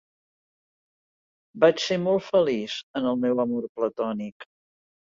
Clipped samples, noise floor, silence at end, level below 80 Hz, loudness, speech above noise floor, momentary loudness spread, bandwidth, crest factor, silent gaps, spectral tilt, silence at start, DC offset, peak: under 0.1%; under -90 dBFS; 0.6 s; -68 dBFS; -25 LUFS; over 66 dB; 9 LU; 7.6 kHz; 22 dB; 2.83-2.94 s, 3.69-3.75 s, 4.32-4.40 s; -5.5 dB/octave; 1.55 s; under 0.1%; -6 dBFS